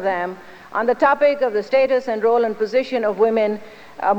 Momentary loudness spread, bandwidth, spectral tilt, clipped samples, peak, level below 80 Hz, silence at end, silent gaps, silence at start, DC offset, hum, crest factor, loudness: 11 LU; 8.2 kHz; -6 dB/octave; under 0.1%; -4 dBFS; -62 dBFS; 0 s; none; 0 s; under 0.1%; none; 14 dB; -19 LUFS